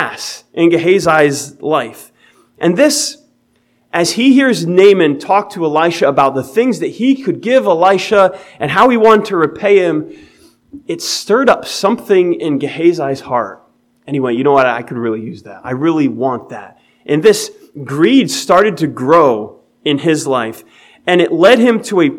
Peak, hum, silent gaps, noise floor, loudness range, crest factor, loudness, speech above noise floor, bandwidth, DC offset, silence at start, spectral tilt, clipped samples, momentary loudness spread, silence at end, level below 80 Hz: 0 dBFS; none; none; -57 dBFS; 4 LU; 12 dB; -12 LUFS; 45 dB; 16 kHz; under 0.1%; 0 s; -4.5 dB/octave; 0.2%; 13 LU; 0 s; -56 dBFS